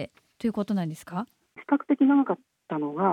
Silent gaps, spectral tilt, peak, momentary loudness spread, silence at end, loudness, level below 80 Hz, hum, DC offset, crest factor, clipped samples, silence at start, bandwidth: none; -8 dB/octave; -10 dBFS; 16 LU; 0 s; -27 LUFS; -68 dBFS; none; under 0.1%; 16 dB; under 0.1%; 0 s; 11.5 kHz